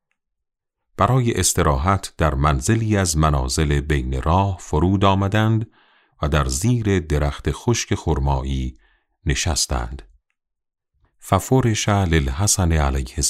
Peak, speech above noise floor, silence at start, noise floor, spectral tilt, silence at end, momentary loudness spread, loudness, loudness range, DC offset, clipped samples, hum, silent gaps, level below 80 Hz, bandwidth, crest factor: -2 dBFS; 60 dB; 1 s; -79 dBFS; -5 dB/octave; 0 s; 7 LU; -20 LUFS; 5 LU; under 0.1%; under 0.1%; none; none; -28 dBFS; 15.5 kHz; 18 dB